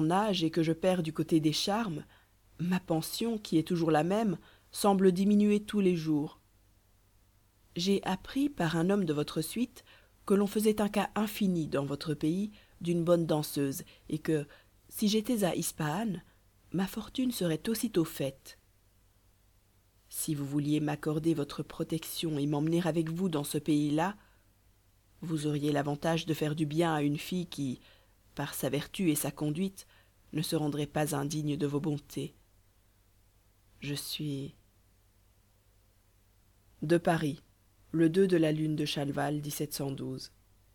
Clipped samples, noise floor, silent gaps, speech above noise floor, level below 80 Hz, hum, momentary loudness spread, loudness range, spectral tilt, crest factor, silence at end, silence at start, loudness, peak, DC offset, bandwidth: under 0.1%; -66 dBFS; none; 36 dB; -62 dBFS; 50 Hz at -60 dBFS; 12 LU; 6 LU; -5.5 dB/octave; 20 dB; 0.45 s; 0 s; -31 LUFS; -12 dBFS; under 0.1%; 19 kHz